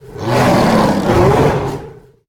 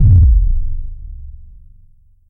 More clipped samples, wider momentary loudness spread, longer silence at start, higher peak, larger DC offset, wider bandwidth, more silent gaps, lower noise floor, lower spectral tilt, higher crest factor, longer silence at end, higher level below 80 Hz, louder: neither; second, 10 LU vs 25 LU; about the same, 0.05 s vs 0 s; about the same, 0 dBFS vs 0 dBFS; neither; first, 17.5 kHz vs 0.8 kHz; neither; second, -35 dBFS vs -46 dBFS; second, -6.5 dB/octave vs -13 dB/octave; about the same, 14 dB vs 12 dB; second, 0.35 s vs 0.85 s; second, -32 dBFS vs -16 dBFS; about the same, -13 LUFS vs -14 LUFS